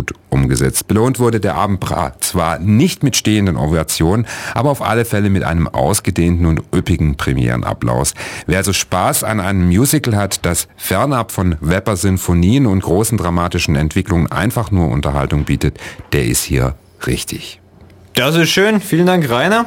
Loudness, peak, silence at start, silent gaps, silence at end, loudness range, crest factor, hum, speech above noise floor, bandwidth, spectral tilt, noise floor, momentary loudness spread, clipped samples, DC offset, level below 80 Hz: -15 LUFS; 0 dBFS; 0 s; none; 0 s; 2 LU; 14 dB; none; 28 dB; 17.5 kHz; -5 dB/octave; -42 dBFS; 6 LU; under 0.1%; under 0.1%; -30 dBFS